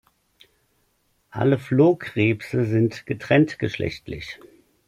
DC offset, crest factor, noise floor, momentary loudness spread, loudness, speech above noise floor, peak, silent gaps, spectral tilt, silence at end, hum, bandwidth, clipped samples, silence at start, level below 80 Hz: under 0.1%; 20 dB; -67 dBFS; 16 LU; -22 LUFS; 46 dB; -4 dBFS; none; -8 dB/octave; 0.5 s; none; 13.5 kHz; under 0.1%; 1.35 s; -54 dBFS